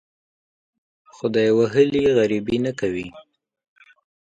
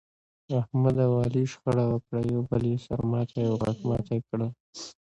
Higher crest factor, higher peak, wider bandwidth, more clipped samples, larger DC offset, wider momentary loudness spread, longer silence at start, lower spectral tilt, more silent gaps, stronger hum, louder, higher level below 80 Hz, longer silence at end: about the same, 18 dB vs 16 dB; first, -4 dBFS vs -10 dBFS; about the same, 8.8 kHz vs 8.2 kHz; neither; neither; first, 11 LU vs 8 LU; first, 1.25 s vs 0.5 s; second, -6.5 dB/octave vs -8.5 dB/octave; second, none vs 4.60-4.73 s; neither; first, -20 LUFS vs -28 LUFS; about the same, -54 dBFS vs -52 dBFS; first, 1 s vs 0.15 s